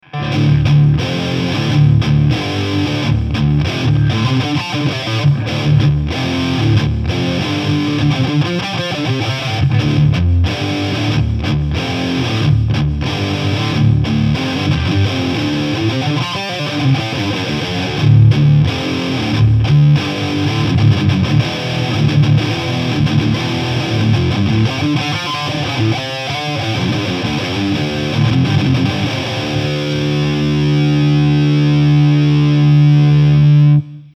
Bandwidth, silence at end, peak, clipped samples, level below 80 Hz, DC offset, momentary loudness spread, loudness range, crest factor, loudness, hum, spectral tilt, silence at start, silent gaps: 8.6 kHz; 0.05 s; 0 dBFS; under 0.1%; -30 dBFS; under 0.1%; 7 LU; 4 LU; 12 dB; -14 LUFS; none; -6.5 dB/octave; 0.15 s; none